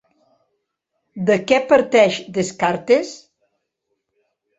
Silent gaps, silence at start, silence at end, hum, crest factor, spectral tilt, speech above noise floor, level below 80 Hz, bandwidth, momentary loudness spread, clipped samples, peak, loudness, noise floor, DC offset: none; 1.15 s; 1.45 s; none; 18 dB; -4.5 dB/octave; 58 dB; -62 dBFS; 8.2 kHz; 9 LU; under 0.1%; -2 dBFS; -17 LUFS; -75 dBFS; under 0.1%